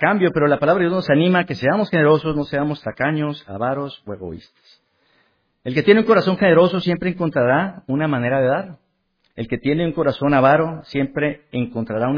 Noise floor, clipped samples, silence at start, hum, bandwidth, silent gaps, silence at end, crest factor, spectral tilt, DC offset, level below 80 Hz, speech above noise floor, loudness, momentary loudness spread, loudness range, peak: -67 dBFS; under 0.1%; 0 s; none; 5.2 kHz; none; 0 s; 18 dB; -8.5 dB/octave; under 0.1%; -50 dBFS; 49 dB; -18 LUFS; 12 LU; 5 LU; 0 dBFS